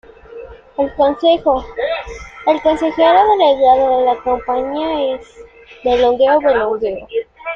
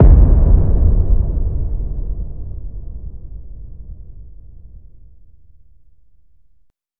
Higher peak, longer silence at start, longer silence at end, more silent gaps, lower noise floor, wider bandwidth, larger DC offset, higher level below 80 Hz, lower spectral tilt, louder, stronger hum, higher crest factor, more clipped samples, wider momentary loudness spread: about the same, -2 dBFS vs 0 dBFS; first, 0.3 s vs 0 s; about the same, 0 s vs 0 s; neither; second, -35 dBFS vs -57 dBFS; first, 7.6 kHz vs 1.8 kHz; second, under 0.1% vs 2%; second, -42 dBFS vs -16 dBFS; second, -5 dB/octave vs -13.5 dB/octave; about the same, -15 LUFS vs -17 LUFS; neither; about the same, 14 dB vs 16 dB; neither; second, 13 LU vs 25 LU